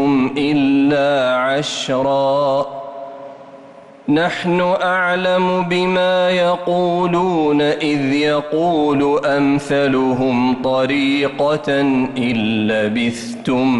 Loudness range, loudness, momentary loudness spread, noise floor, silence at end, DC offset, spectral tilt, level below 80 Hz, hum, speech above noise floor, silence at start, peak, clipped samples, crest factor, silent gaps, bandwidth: 3 LU; -16 LUFS; 4 LU; -40 dBFS; 0 s; under 0.1%; -6 dB/octave; -52 dBFS; none; 24 dB; 0 s; -6 dBFS; under 0.1%; 10 dB; none; 11.5 kHz